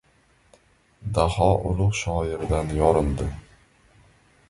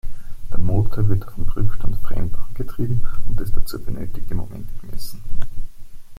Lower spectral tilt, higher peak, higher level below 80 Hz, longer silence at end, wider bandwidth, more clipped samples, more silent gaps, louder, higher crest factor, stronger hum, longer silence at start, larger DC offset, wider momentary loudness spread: about the same, -6.5 dB/octave vs -7.5 dB/octave; about the same, -4 dBFS vs -2 dBFS; second, -34 dBFS vs -24 dBFS; first, 1.1 s vs 0.05 s; second, 11.5 kHz vs 13 kHz; neither; neither; first, -23 LUFS vs -28 LUFS; first, 22 dB vs 12 dB; neither; first, 1 s vs 0.05 s; neither; second, 11 LU vs 15 LU